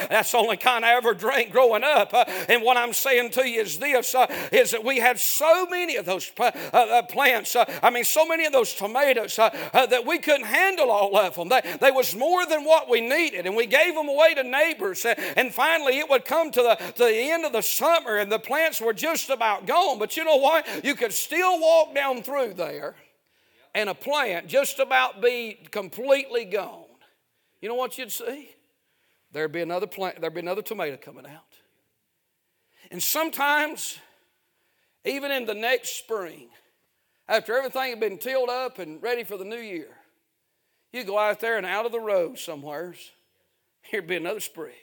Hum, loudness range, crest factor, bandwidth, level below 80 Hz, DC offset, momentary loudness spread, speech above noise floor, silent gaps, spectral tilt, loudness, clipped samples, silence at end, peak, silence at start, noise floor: none; 10 LU; 22 dB; 19.5 kHz; -80 dBFS; under 0.1%; 13 LU; 52 dB; none; -1.5 dB/octave; -23 LUFS; under 0.1%; 0.1 s; -2 dBFS; 0 s; -75 dBFS